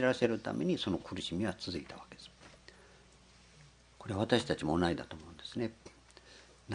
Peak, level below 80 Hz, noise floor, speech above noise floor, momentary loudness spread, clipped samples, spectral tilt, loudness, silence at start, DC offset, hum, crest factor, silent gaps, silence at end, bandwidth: -12 dBFS; -64 dBFS; -61 dBFS; 26 dB; 25 LU; under 0.1%; -5.5 dB/octave; -35 LUFS; 0 s; under 0.1%; 60 Hz at -65 dBFS; 26 dB; none; 0 s; 10.5 kHz